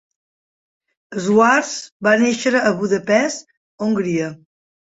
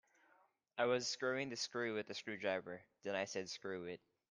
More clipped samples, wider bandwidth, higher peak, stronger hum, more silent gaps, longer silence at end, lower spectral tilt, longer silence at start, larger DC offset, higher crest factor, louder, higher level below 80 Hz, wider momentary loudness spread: neither; second, 8 kHz vs 10 kHz; first, -2 dBFS vs -22 dBFS; neither; first, 1.92-2.00 s, 3.57-3.78 s vs none; first, 0.6 s vs 0.35 s; first, -4.5 dB/octave vs -3 dB/octave; first, 1.1 s vs 0.75 s; neither; about the same, 18 dB vs 20 dB; first, -17 LUFS vs -42 LUFS; first, -62 dBFS vs -88 dBFS; about the same, 12 LU vs 13 LU